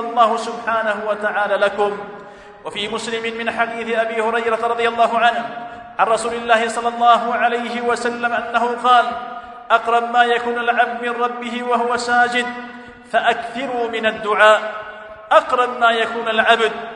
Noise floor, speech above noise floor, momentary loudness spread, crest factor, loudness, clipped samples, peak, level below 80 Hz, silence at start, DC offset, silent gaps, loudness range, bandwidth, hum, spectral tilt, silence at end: -38 dBFS; 21 dB; 14 LU; 18 dB; -18 LUFS; under 0.1%; 0 dBFS; -60 dBFS; 0 s; under 0.1%; none; 4 LU; 11 kHz; none; -3 dB/octave; 0 s